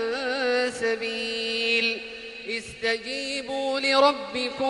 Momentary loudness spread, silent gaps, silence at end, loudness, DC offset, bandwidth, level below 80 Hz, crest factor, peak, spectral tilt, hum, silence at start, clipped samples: 11 LU; none; 0 s; -25 LUFS; under 0.1%; 11.5 kHz; -62 dBFS; 20 dB; -6 dBFS; -2 dB/octave; none; 0 s; under 0.1%